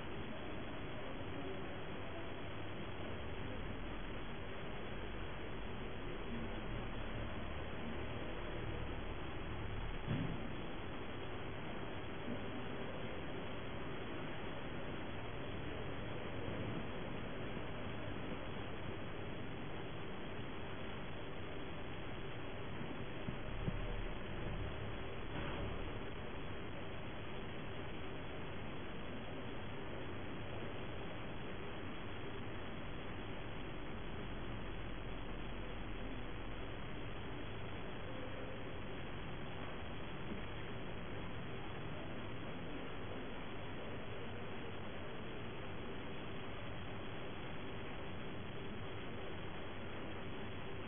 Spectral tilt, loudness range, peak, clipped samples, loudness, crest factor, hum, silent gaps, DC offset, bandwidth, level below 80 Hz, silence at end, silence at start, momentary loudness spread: -4 dB/octave; 2 LU; -26 dBFS; under 0.1%; -47 LUFS; 18 dB; none; none; 0.5%; 3.6 kHz; -54 dBFS; 0 s; 0 s; 3 LU